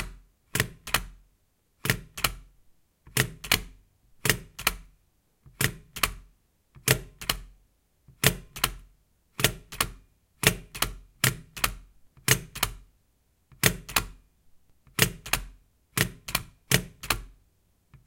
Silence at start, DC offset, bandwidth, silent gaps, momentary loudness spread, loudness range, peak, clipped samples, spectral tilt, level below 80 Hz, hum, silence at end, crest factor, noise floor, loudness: 0 s; under 0.1%; 17 kHz; none; 6 LU; 3 LU; -2 dBFS; under 0.1%; -2.5 dB/octave; -46 dBFS; none; 0.75 s; 30 dB; -69 dBFS; -28 LUFS